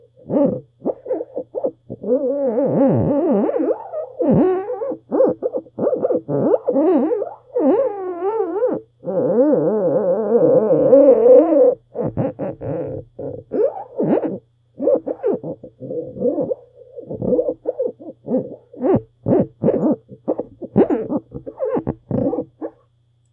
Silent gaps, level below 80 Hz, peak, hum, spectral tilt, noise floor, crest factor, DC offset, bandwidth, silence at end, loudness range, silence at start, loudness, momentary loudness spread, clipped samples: none; -54 dBFS; 0 dBFS; none; -12.5 dB/octave; -59 dBFS; 18 dB; under 0.1%; 3.1 kHz; 0.65 s; 8 LU; 0.25 s; -19 LUFS; 13 LU; under 0.1%